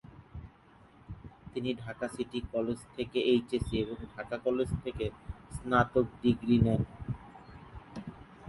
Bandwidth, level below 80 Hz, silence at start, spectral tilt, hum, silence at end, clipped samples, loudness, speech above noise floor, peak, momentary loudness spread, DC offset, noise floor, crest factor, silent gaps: 11.5 kHz; -50 dBFS; 0.15 s; -7 dB/octave; none; 0 s; under 0.1%; -32 LUFS; 28 dB; -12 dBFS; 22 LU; under 0.1%; -59 dBFS; 20 dB; none